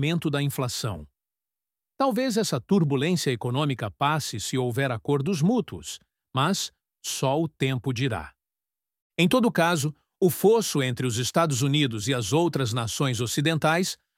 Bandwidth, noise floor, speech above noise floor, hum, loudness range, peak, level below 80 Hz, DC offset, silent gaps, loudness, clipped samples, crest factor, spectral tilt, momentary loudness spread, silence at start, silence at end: 16.5 kHz; under -90 dBFS; over 65 dB; none; 4 LU; -8 dBFS; -58 dBFS; under 0.1%; 9.02-9.10 s; -25 LUFS; under 0.1%; 18 dB; -5 dB/octave; 10 LU; 0 s; 0.25 s